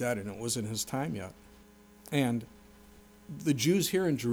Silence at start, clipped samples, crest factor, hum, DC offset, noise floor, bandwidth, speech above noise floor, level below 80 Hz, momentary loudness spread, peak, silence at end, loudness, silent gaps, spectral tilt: 0 s; under 0.1%; 18 dB; none; under 0.1%; -57 dBFS; over 20 kHz; 26 dB; -62 dBFS; 14 LU; -16 dBFS; 0 s; -31 LUFS; none; -4.5 dB/octave